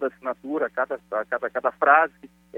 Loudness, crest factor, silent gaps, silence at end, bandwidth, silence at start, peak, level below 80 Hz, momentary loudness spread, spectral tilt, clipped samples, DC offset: -23 LUFS; 22 dB; none; 0 s; 4.2 kHz; 0 s; -2 dBFS; -68 dBFS; 11 LU; -6 dB/octave; under 0.1%; under 0.1%